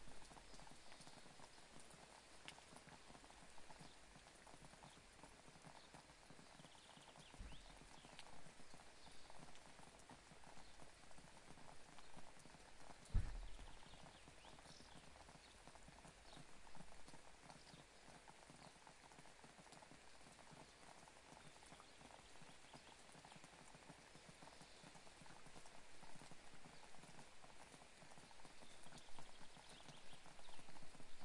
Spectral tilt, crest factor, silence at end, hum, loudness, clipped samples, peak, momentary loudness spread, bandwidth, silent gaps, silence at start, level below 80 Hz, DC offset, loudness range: -3.5 dB/octave; 28 dB; 0 s; none; -62 LUFS; under 0.1%; -28 dBFS; 3 LU; 11.5 kHz; none; 0 s; -64 dBFS; under 0.1%; 6 LU